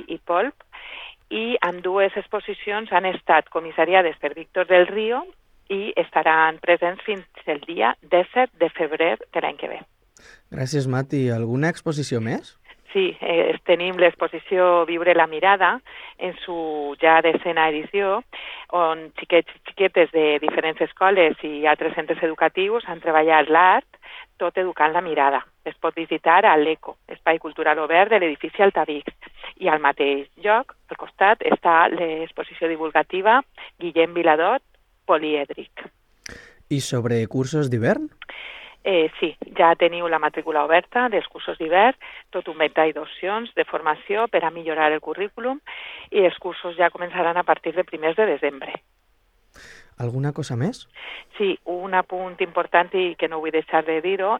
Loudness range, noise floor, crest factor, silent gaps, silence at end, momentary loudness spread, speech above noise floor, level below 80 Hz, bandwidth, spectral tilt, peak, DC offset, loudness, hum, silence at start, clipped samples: 5 LU; -62 dBFS; 22 dB; none; 0 s; 15 LU; 41 dB; -62 dBFS; 11 kHz; -5.5 dB/octave; 0 dBFS; under 0.1%; -21 LUFS; none; 0 s; under 0.1%